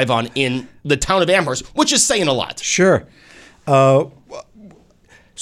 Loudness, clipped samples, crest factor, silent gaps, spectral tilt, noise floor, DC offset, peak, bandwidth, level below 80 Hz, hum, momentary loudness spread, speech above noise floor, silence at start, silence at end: -16 LUFS; under 0.1%; 16 dB; none; -3.5 dB/octave; -50 dBFS; under 0.1%; -2 dBFS; 15 kHz; -44 dBFS; none; 15 LU; 34 dB; 0 s; 0 s